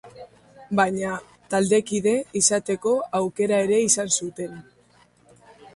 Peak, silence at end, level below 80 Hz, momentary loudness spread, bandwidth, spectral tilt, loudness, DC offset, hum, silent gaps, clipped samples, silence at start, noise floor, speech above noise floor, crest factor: -2 dBFS; 0.05 s; -62 dBFS; 11 LU; 11.5 kHz; -3.5 dB/octave; -22 LUFS; under 0.1%; 60 Hz at -55 dBFS; none; under 0.1%; 0.05 s; -58 dBFS; 35 dB; 22 dB